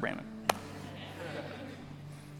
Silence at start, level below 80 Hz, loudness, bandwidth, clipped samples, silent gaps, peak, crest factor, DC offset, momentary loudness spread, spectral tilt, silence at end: 0 s; -64 dBFS; -40 LUFS; 19 kHz; under 0.1%; none; -6 dBFS; 34 dB; under 0.1%; 13 LU; -4 dB/octave; 0 s